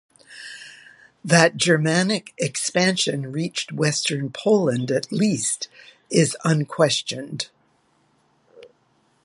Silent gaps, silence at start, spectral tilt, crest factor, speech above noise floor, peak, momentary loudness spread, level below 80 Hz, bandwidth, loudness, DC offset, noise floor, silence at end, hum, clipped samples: none; 0.3 s; -4 dB/octave; 22 dB; 42 dB; 0 dBFS; 17 LU; -66 dBFS; 11.5 kHz; -21 LUFS; under 0.1%; -63 dBFS; 0.6 s; none; under 0.1%